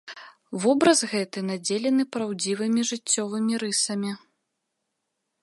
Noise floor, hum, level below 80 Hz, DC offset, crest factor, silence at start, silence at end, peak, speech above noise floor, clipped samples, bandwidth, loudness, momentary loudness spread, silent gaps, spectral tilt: -80 dBFS; none; -76 dBFS; under 0.1%; 22 dB; 0.05 s; 1.25 s; -4 dBFS; 55 dB; under 0.1%; 11.5 kHz; -24 LUFS; 13 LU; none; -3.5 dB/octave